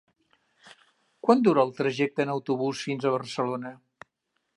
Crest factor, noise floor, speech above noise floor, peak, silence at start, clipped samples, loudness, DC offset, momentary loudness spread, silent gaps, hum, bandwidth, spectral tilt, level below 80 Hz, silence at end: 22 dB; -78 dBFS; 53 dB; -6 dBFS; 0.65 s; under 0.1%; -26 LUFS; under 0.1%; 9 LU; none; none; 11.5 kHz; -6 dB/octave; -80 dBFS; 0.8 s